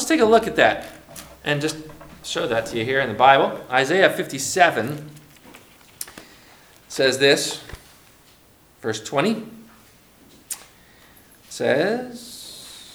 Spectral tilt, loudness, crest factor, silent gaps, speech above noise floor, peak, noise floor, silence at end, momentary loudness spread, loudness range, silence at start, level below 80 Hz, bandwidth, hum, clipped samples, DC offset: -3.5 dB/octave; -20 LUFS; 22 dB; none; 34 dB; 0 dBFS; -53 dBFS; 0.1 s; 21 LU; 10 LU; 0 s; -56 dBFS; over 20 kHz; none; under 0.1%; under 0.1%